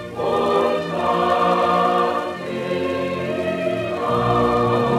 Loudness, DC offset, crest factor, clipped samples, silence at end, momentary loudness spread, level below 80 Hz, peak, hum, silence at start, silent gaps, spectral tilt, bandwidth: -20 LUFS; under 0.1%; 14 dB; under 0.1%; 0 s; 6 LU; -48 dBFS; -4 dBFS; none; 0 s; none; -6.5 dB/octave; 15 kHz